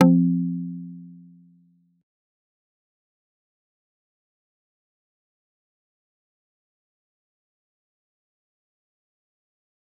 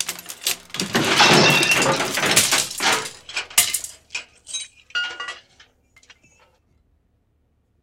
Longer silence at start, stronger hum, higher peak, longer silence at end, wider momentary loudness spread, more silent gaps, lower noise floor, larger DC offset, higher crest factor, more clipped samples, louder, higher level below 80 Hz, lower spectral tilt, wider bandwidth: about the same, 0 s vs 0 s; neither; about the same, -2 dBFS vs 0 dBFS; first, 8.85 s vs 2.45 s; first, 25 LU vs 19 LU; neither; second, -60 dBFS vs -65 dBFS; neither; first, 28 dB vs 22 dB; neither; second, -22 LUFS vs -18 LUFS; second, -84 dBFS vs -58 dBFS; first, -9.5 dB/octave vs -1.5 dB/octave; second, 3 kHz vs 17 kHz